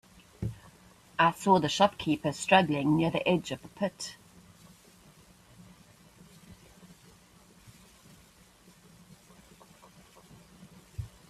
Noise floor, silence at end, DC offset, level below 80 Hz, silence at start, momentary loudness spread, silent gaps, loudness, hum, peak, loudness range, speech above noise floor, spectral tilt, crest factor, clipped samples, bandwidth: -59 dBFS; 0.25 s; under 0.1%; -60 dBFS; 0.4 s; 18 LU; none; -28 LUFS; none; -8 dBFS; 16 LU; 32 dB; -5 dB/octave; 24 dB; under 0.1%; 14.5 kHz